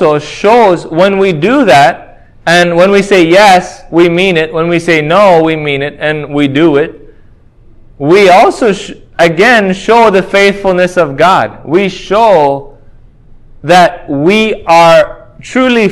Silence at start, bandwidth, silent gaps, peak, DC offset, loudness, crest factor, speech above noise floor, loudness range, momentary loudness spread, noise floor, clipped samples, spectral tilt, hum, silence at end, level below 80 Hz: 0 s; 16 kHz; none; 0 dBFS; under 0.1%; -7 LUFS; 8 dB; 31 dB; 3 LU; 9 LU; -38 dBFS; 3%; -5 dB/octave; none; 0 s; -40 dBFS